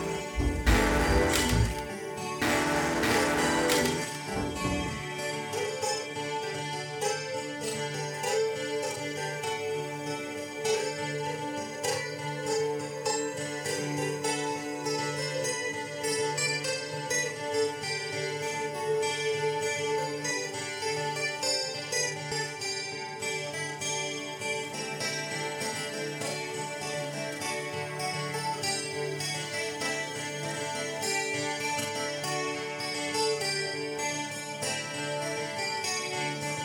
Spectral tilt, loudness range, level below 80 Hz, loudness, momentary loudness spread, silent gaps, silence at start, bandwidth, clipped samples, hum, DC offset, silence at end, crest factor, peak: -3 dB/octave; 5 LU; -44 dBFS; -30 LUFS; 8 LU; none; 0 s; 19 kHz; under 0.1%; none; under 0.1%; 0 s; 20 dB; -10 dBFS